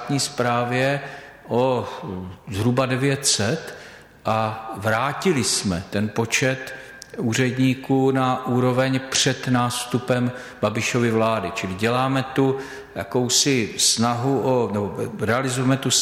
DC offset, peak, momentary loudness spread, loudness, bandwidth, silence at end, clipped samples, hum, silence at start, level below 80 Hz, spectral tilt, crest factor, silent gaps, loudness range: under 0.1%; -6 dBFS; 11 LU; -21 LUFS; 16 kHz; 0 s; under 0.1%; none; 0 s; -56 dBFS; -4 dB/octave; 16 dB; none; 2 LU